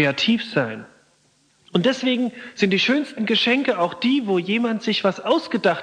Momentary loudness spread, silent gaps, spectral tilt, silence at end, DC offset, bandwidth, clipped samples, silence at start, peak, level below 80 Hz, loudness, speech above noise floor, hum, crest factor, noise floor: 6 LU; none; -5 dB/octave; 0 s; under 0.1%; 10 kHz; under 0.1%; 0 s; -4 dBFS; -68 dBFS; -21 LUFS; 40 dB; none; 16 dB; -61 dBFS